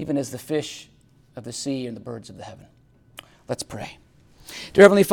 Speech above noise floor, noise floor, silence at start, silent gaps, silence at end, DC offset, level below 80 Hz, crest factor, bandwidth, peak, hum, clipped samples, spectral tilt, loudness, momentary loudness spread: 26 dB; -48 dBFS; 0 s; none; 0 s; under 0.1%; -56 dBFS; 22 dB; 18 kHz; 0 dBFS; none; under 0.1%; -5 dB/octave; -22 LUFS; 28 LU